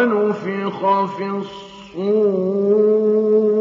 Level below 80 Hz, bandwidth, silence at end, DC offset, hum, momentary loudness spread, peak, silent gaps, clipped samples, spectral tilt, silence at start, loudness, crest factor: -66 dBFS; 7 kHz; 0 s; under 0.1%; none; 12 LU; -4 dBFS; none; under 0.1%; -8 dB/octave; 0 s; -18 LUFS; 14 dB